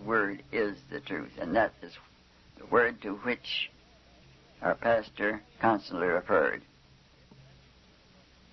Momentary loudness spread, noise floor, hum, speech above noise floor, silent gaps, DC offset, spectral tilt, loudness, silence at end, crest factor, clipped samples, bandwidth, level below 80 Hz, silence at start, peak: 11 LU; -60 dBFS; none; 29 dB; none; under 0.1%; -6 dB/octave; -30 LUFS; 1.95 s; 20 dB; under 0.1%; 6.2 kHz; -60 dBFS; 0 s; -12 dBFS